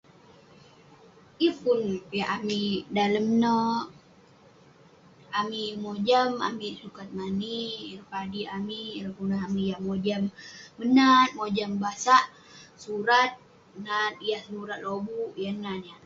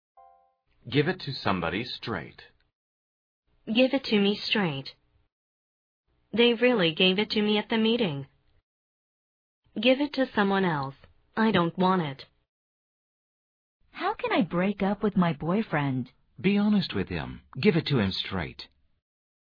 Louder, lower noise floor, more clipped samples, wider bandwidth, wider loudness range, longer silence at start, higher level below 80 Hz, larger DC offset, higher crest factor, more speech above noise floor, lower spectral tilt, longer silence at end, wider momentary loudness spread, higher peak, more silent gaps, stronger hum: about the same, -27 LUFS vs -26 LUFS; second, -56 dBFS vs -65 dBFS; neither; first, 7.8 kHz vs 5.4 kHz; first, 8 LU vs 5 LU; first, 1.4 s vs 0.85 s; second, -66 dBFS vs -58 dBFS; neither; about the same, 22 dB vs 20 dB; second, 29 dB vs 39 dB; second, -5 dB/octave vs -7.5 dB/octave; second, 0.1 s vs 0.8 s; about the same, 15 LU vs 14 LU; about the same, -6 dBFS vs -8 dBFS; second, none vs 2.75-3.43 s, 5.32-6.04 s, 8.63-9.62 s, 12.49-13.80 s; neither